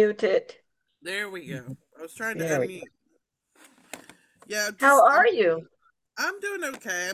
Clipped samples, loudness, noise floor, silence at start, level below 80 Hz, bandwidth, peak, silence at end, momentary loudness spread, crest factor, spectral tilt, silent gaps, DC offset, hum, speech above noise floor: under 0.1%; -24 LUFS; -73 dBFS; 0 s; -74 dBFS; 16 kHz; -6 dBFS; 0 s; 26 LU; 20 dB; -3.5 dB/octave; none; under 0.1%; none; 48 dB